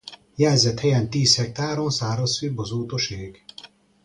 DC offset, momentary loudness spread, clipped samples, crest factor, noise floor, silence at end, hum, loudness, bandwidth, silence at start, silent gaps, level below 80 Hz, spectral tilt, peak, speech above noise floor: under 0.1%; 19 LU; under 0.1%; 20 dB; -47 dBFS; 0.4 s; none; -22 LUFS; 11 kHz; 0.05 s; none; -52 dBFS; -4.5 dB/octave; -4 dBFS; 25 dB